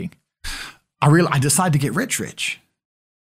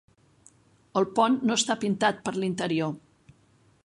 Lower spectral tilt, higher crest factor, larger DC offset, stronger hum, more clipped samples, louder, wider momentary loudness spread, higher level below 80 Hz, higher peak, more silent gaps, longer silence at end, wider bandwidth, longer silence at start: about the same, -4.5 dB/octave vs -4 dB/octave; about the same, 18 dB vs 20 dB; neither; neither; neither; first, -19 LUFS vs -26 LUFS; first, 18 LU vs 8 LU; first, -46 dBFS vs -68 dBFS; first, -4 dBFS vs -8 dBFS; neither; about the same, 0.75 s vs 0.85 s; first, 16 kHz vs 11.5 kHz; second, 0 s vs 0.95 s